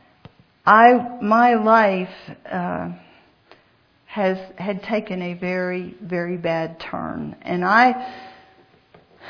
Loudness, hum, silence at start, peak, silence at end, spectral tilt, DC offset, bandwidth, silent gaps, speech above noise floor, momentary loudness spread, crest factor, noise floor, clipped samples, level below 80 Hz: -19 LUFS; none; 0.65 s; 0 dBFS; 0 s; -7.5 dB/octave; under 0.1%; 5.4 kHz; none; 39 dB; 17 LU; 20 dB; -58 dBFS; under 0.1%; -60 dBFS